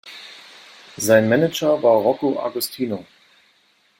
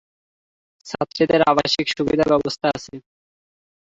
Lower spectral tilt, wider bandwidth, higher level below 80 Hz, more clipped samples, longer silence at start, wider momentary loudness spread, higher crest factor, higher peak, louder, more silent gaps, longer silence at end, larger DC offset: about the same, -4.5 dB/octave vs -5 dB/octave; first, 16.5 kHz vs 8 kHz; second, -64 dBFS vs -52 dBFS; neither; second, 0.05 s vs 0.85 s; first, 22 LU vs 13 LU; about the same, 18 dB vs 20 dB; about the same, -2 dBFS vs -2 dBFS; about the same, -19 LUFS vs -19 LUFS; neither; about the same, 0.95 s vs 1 s; neither